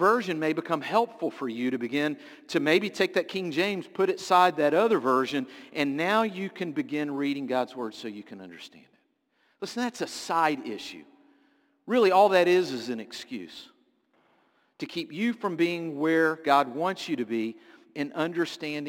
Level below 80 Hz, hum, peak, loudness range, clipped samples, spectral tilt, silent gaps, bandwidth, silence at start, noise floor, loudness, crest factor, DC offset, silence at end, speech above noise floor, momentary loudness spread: -76 dBFS; none; -8 dBFS; 8 LU; under 0.1%; -5 dB/octave; none; 17 kHz; 0 s; -71 dBFS; -27 LUFS; 20 dB; under 0.1%; 0 s; 44 dB; 17 LU